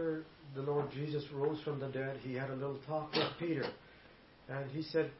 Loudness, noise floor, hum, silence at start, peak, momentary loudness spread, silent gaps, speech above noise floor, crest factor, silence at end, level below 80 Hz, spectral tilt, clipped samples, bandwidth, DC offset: -39 LUFS; -60 dBFS; none; 0 s; -20 dBFS; 11 LU; none; 22 dB; 18 dB; 0 s; -70 dBFS; -4.5 dB/octave; under 0.1%; 5.8 kHz; under 0.1%